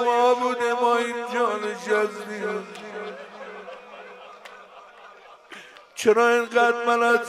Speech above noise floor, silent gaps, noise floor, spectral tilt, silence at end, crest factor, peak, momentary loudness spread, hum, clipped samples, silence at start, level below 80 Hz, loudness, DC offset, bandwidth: 26 dB; none; -47 dBFS; -3 dB/octave; 0 s; 18 dB; -6 dBFS; 23 LU; none; under 0.1%; 0 s; -78 dBFS; -22 LUFS; under 0.1%; 14.5 kHz